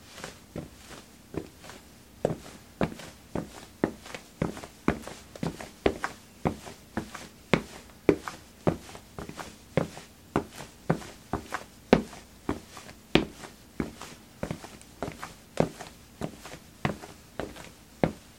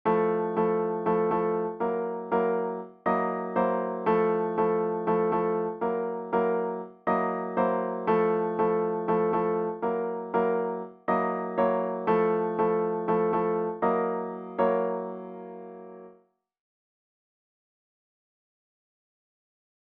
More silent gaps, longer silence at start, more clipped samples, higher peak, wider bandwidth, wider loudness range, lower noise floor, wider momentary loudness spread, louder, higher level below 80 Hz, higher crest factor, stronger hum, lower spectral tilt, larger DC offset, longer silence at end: neither; about the same, 0 s vs 0.05 s; neither; first, 0 dBFS vs -12 dBFS; first, 16.5 kHz vs 4.2 kHz; about the same, 6 LU vs 4 LU; second, -51 dBFS vs -62 dBFS; first, 18 LU vs 8 LU; second, -33 LUFS vs -27 LUFS; first, -52 dBFS vs -66 dBFS; first, 34 dB vs 16 dB; neither; second, -5.5 dB/octave vs -10.5 dB/octave; neither; second, 0 s vs 3.9 s